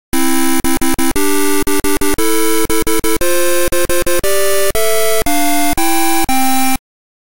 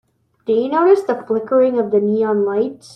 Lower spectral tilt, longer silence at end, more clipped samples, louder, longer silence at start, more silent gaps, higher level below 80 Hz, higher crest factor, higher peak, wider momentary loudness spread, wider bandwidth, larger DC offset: second, -2.5 dB/octave vs -7.5 dB/octave; first, 0.45 s vs 0.2 s; neither; about the same, -14 LUFS vs -16 LUFS; second, 0.1 s vs 0.45 s; neither; first, -30 dBFS vs -66 dBFS; second, 8 dB vs 14 dB; about the same, -4 dBFS vs -2 dBFS; second, 2 LU vs 7 LU; first, 17 kHz vs 9.8 kHz; first, 20% vs under 0.1%